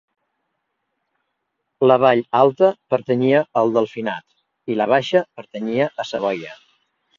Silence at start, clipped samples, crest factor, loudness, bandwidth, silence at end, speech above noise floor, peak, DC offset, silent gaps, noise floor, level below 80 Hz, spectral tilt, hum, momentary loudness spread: 1.8 s; under 0.1%; 20 dB; -19 LUFS; 7.4 kHz; 0.65 s; 57 dB; 0 dBFS; under 0.1%; none; -76 dBFS; -68 dBFS; -6.5 dB/octave; none; 14 LU